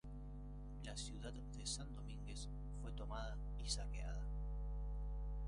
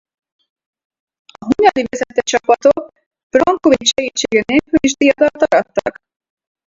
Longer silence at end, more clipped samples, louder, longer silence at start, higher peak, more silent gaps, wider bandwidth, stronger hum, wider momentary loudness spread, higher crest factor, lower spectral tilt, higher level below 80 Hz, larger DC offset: second, 0 s vs 0.75 s; neither; second, -49 LUFS vs -14 LUFS; second, 0.05 s vs 1.4 s; second, -28 dBFS vs 0 dBFS; second, none vs 3.06-3.11 s, 3.23-3.30 s; first, 11 kHz vs 7.8 kHz; first, 50 Hz at -50 dBFS vs none; about the same, 8 LU vs 8 LU; about the same, 20 dB vs 16 dB; about the same, -4 dB/octave vs -3 dB/octave; about the same, -48 dBFS vs -48 dBFS; neither